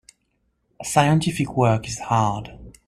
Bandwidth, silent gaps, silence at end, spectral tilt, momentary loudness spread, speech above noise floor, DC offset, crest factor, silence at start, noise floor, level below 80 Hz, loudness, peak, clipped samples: 14 kHz; none; 0.2 s; -5.5 dB/octave; 14 LU; 49 dB; under 0.1%; 20 dB; 0.8 s; -70 dBFS; -48 dBFS; -21 LUFS; -4 dBFS; under 0.1%